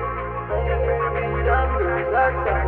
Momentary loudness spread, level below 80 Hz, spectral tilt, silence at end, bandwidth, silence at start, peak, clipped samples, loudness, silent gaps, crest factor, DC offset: 6 LU; -28 dBFS; -10 dB/octave; 0 s; 4 kHz; 0 s; -6 dBFS; under 0.1%; -22 LUFS; none; 14 dB; under 0.1%